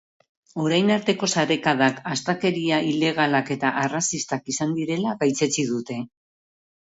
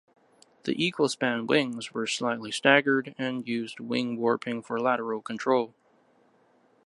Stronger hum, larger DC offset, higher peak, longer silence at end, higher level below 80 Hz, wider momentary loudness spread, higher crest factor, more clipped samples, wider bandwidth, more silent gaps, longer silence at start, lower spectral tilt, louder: neither; neither; about the same, -6 dBFS vs -4 dBFS; second, 0.8 s vs 1.15 s; first, -66 dBFS vs -78 dBFS; second, 7 LU vs 11 LU; second, 18 dB vs 26 dB; neither; second, 8 kHz vs 11.5 kHz; neither; about the same, 0.55 s vs 0.65 s; about the same, -4 dB/octave vs -4 dB/octave; first, -23 LUFS vs -27 LUFS